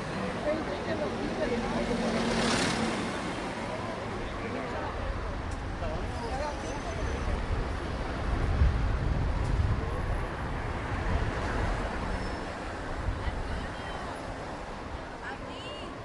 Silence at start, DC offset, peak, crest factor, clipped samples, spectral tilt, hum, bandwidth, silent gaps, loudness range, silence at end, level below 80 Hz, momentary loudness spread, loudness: 0 s; under 0.1%; -14 dBFS; 18 dB; under 0.1%; -5.5 dB/octave; none; 11.5 kHz; none; 5 LU; 0 s; -36 dBFS; 10 LU; -33 LUFS